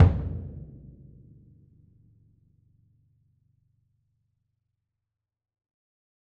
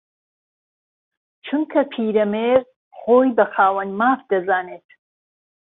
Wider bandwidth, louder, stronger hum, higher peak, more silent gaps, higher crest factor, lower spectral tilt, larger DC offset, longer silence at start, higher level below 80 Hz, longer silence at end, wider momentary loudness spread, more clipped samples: about the same, 3.8 kHz vs 4 kHz; second, -29 LUFS vs -19 LUFS; neither; about the same, -4 dBFS vs -2 dBFS; second, none vs 2.76-2.91 s; first, 26 dB vs 18 dB; about the same, -10 dB/octave vs -10 dB/octave; neither; second, 0 s vs 1.45 s; first, -42 dBFS vs -66 dBFS; first, 5.65 s vs 0.95 s; first, 26 LU vs 9 LU; neither